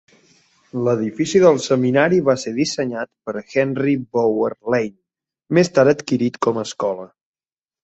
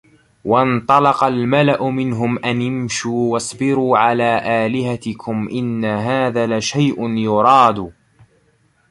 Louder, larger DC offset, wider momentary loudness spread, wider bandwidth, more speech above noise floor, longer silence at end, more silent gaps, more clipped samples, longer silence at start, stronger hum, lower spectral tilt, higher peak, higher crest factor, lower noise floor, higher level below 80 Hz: second, -19 LUFS vs -16 LUFS; neither; about the same, 11 LU vs 9 LU; second, 8.2 kHz vs 11.5 kHz; first, over 72 dB vs 42 dB; second, 0.8 s vs 1 s; neither; neither; first, 0.75 s vs 0.45 s; neither; about the same, -5.5 dB/octave vs -5.5 dB/octave; about the same, -2 dBFS vs 0 dBFS; about the same, 18 dB vs 16 dB; first, under -90 dBFS vs -58 dBFS; second, -60 dBFS vs -52 dBFS